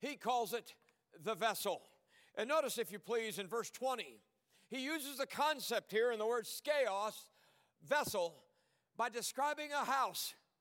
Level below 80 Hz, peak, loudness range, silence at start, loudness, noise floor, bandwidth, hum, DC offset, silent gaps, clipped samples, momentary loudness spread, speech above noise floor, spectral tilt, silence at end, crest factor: -88 dBFS; -20 dBFS; 3 LU; 0 s; -39 LUFS; -78 dBFS; 17 kHz; none; under 0.1%; none; under 0.1%; 9 LU; 39 dB; -2 dB/octave; 0.25 s; 20 dB